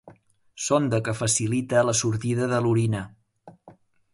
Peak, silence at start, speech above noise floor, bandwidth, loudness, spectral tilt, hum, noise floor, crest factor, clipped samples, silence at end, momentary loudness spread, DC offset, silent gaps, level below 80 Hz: -8 dBFS; 0.05 s; 30 dB; 11.5 kHz; -24 LUFS; -5 dB/octave; none; -54 dBFS; 18 dB; under 0.1%; 0.4 s; 7 LU; under 0.1%; none; -56 dBFS